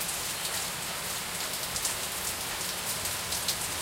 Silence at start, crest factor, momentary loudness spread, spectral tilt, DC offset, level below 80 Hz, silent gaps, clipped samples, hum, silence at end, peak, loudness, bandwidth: 0 s; 24 dB; 3 LU; -0.5 dB/octave; under 0.1%; -56 dBFS; none; under 0.1%; none; 0 s; -10 dBFS; -30 LUFS; 17 kHz